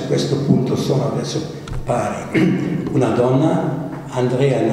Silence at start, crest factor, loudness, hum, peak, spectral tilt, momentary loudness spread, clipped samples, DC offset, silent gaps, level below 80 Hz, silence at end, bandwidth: 0 s; 18 dB; -19 LUFS; none; 0 dBFS; -7 dB/octave; 9 LU; under 0.1%; under 0.1%; none; -40 dBFS; 0 s; 13 kHz